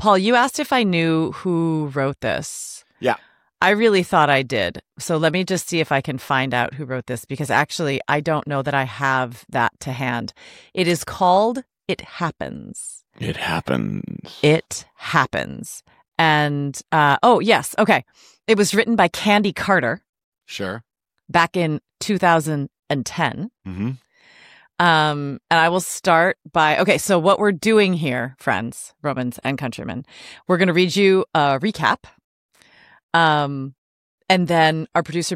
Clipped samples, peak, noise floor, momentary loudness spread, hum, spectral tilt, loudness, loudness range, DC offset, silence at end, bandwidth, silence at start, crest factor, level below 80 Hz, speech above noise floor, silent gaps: under 0.1%; -2 dBFS; -52 dBFS; 14 LU; none; -4.5 dB/octave; -19 LUFS; 5 LU; under 0.1%; 0 s; 16.5 kHz; 0 s; 18 dB; -58 dBFS; 33 dB; 20.09-20.13 s, 20.24-20.32 s, 32.24-32.49 s, 33.03-33.09 s, 33.78-34.18 s